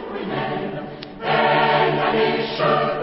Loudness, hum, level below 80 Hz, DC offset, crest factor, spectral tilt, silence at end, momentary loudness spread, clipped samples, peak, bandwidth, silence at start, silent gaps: -20 LUFS; none; -52 dBFS; under 0.1%; 14 dB; -10 dB/octave; 0 s; 13 LU; under 0.1%; -6 dBFS; 5.8 kHz; 0 s; none